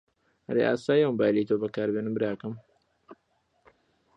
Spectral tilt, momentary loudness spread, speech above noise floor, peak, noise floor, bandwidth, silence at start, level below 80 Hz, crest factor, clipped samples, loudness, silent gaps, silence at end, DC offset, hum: -7.5 dB/octave; 11 LU; 46 dB; -12 dBFS; -72 dBFS; 8.8 kHz; 0.5 s; -70 dBFS; 18 dB; under 0.1%; -27 LUFS; none; 1.05 s; under 0.1%; none